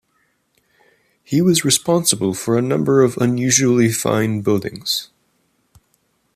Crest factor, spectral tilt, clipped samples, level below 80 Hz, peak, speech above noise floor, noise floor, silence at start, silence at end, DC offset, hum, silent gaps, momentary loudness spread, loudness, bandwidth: 18 dB; -4 dB/octave; under 0.1%; -58 dBFS; 0 dBFS; 48 dB; -65 dBFS; 1.3 s; 1.3 s; under 0.1%; none; none; 7 LU; -17 LUFS; 15 kHz